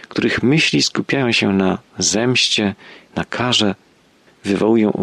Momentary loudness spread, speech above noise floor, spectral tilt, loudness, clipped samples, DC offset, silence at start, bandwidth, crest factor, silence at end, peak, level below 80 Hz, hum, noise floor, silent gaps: 12 LU; 36 dB; -4 dB/octave; -16 LUFS; under 0.1%; under 0.1%; 0.1 s; 12 kHz; 14 dB; 0 s; -4 dBFS; -52 dBFS; none; -53 dBFS; none